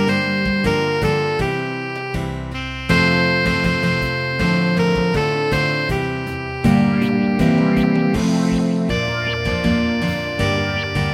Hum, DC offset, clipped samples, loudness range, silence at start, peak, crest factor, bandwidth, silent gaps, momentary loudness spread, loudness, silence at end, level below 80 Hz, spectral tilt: none; under 0.1%; under 0.1%; 2 LU; 0 s; -2 dBFS; 16 dB; 14.5 kHz; none; 8 LU; -18 LUFS; 0 s; -34 dBFS; -6 dB/octave